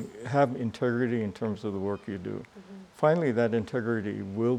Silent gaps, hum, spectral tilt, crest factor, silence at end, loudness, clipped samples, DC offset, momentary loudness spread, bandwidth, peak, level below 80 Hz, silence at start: none; none; -8 dB/octave; 20 dB; 0 s; -29 LUFS; under 0.1%; under 0.1%; 13 LU; 11 kHz; -10 dBFS; -68 dBFS; 0 s